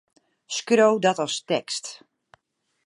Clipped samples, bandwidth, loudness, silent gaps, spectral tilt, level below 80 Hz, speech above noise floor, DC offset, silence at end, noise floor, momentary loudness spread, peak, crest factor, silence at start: under 0.1%; 11.5 kHz; -23 LUFS; none; -3.5 dB/octave; -78 dBFS; 46 dB; under 0.1%; 0.9 s; -69 dBFS; 13 LU; -6 dBFS; 20 dB; 0.5 s